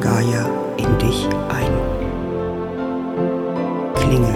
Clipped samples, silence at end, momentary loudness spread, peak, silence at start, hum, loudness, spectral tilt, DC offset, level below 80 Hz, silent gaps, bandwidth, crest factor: under 0.1%; 0 s; 6 LU; 0 dBFS; 0 s; none; -20 LUFS; -6.5 dB/octave; under 0.1%; -30 dBFS; none; 16 kHz; 18 dB